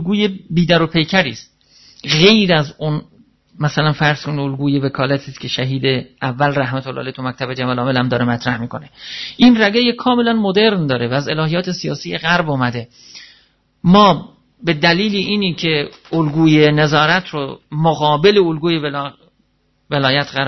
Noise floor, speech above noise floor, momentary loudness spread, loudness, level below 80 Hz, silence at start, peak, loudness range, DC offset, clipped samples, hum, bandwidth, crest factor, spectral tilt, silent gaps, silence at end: -61 dBFS; 45 dB; 13 LU; -15 LUFS; -48 dBFS; 0 s; 0 dBFS; 5 LU; under 0.1%; under 0.1%; none; 6.2 kHz; 16 dB; -6 dB/octave; none; 0 s